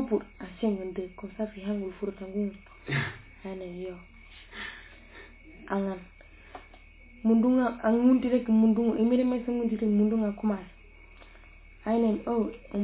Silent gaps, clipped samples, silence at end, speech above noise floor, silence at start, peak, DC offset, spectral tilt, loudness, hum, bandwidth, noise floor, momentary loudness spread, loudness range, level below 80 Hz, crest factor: none; under 0.1%; 0 s; 25 dB; 0 s; -12 dBFS; under 0.1%; -7 dB/octave; -28 LUFS; none; 4 kHz; -52 dBFS; 23 LU; 13 LU; -54 dBFS; 16 dB